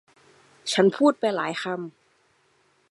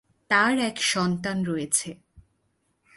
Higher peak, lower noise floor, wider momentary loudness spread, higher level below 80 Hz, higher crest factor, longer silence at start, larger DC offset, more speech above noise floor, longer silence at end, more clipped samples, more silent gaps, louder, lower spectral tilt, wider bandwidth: about the same, -6 dBFS vs -6 dBFS; second, -65 dBFS vs -72 dBFS; first, 15 LU vs 7 LU; second, -80 dBFS vs -62 dBFS; about the same, 20 dB vs 20 dB; first, 0.65 s vs 0.3 s; neither; second, 42 dB vs 47 dB; first, 1 s vs 0.75 s; neither; neither; about the same, -24 LUFS vs -24 LUFS; first, -4.5 dB/octave vs -3 dB/octave; about the same, 11.5 kHz vs 12 kHz